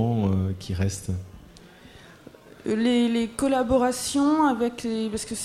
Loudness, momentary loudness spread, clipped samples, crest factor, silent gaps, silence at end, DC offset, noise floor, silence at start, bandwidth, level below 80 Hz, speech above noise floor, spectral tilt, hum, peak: -24 LUFS; 10 LU; under 0.1%; 16 dB; none; 0 s; under 0.1%; -48 dBFS; 0 s; 15 kHz; -48 dBFS; 25 dB; -5.5 dB/octave; none; -10 dBFS